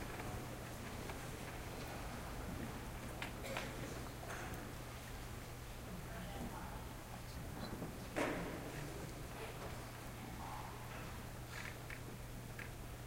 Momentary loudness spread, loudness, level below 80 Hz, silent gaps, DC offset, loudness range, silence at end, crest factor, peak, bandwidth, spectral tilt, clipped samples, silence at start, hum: 5 LU; -48 LUFS; -54 dBFS; none; under 0.1%; 3 LU; 0 s; 22 dB; -24 dBFS; 16 kHz; -4.5 dB/octave; under 0.1%; 0 s; none